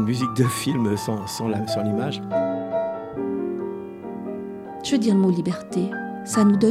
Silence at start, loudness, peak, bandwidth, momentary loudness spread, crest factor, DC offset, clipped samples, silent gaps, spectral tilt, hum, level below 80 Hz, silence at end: 0 s; -24 LUFS; -4 dBFS; 15.5 kHz; 13 LU; 18 dB; under 0.1%; under 0.1%; none; -6 dB/octave; none; -60 dBFS; 0 s